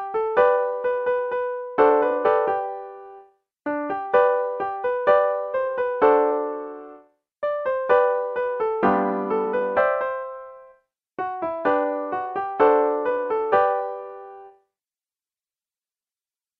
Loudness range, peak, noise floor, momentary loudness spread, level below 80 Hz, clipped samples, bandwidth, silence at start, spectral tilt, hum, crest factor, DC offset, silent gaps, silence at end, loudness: 3 LU; -4 dBFS; under -90 dBFS; 15 LU; -66 dBFS; under 0.1%; 4.4 kHz; 0 s; -8 dB/octave; none; 18 dB; under 0.1%; none; 2.1 s; -22 LUFS